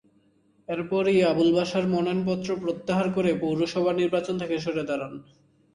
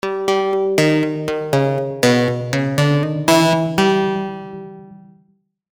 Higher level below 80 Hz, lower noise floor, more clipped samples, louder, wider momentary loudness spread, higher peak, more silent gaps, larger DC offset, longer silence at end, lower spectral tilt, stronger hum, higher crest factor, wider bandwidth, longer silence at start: second, -62 dBFS vs -56 dBFS; about the same, -63 dBFS vs -60 dBFS; neither; second, -25 LUFS vs -17 LUFS; about the same, 11 LU vs 11 LU; second, -10 dBFS vs -2 dBFS; neither; second, under 0.1% vs 0.1%; second, 0.5 s vs 0.75 s; about the same, -6.5 dB/octave vs -5.5 dB/octave; neither; about the same, 16 dB vs 16 dB; second, 11 kHz vs over 20 kHz; first, 0.7 s vs 0.05 s